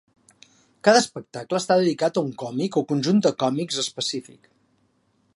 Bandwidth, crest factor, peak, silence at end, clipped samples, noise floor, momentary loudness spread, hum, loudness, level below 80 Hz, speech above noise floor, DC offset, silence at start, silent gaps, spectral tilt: 11.5 kHz; 22 dB; -2 dBFS; 1.15 s; under 0.1%; -66 dBFS; 10 LU; none; -22 LUFS; -72 dBFS; 44 dB; under 0.1%; 0.85 s; none; -4.5 dB/octave